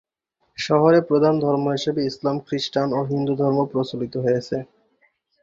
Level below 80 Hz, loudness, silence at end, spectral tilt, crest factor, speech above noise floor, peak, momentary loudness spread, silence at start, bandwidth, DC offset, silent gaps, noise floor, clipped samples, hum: -62 dBFS; -21 LUFS; 0.8 s; -6.5 dB/octave; 18 dB; 51 dB; -4 dBFS; 10 LU; 0.6 s; 7.8 kHz; under 0.1%; none; -71 dBFS; under 0.1%; none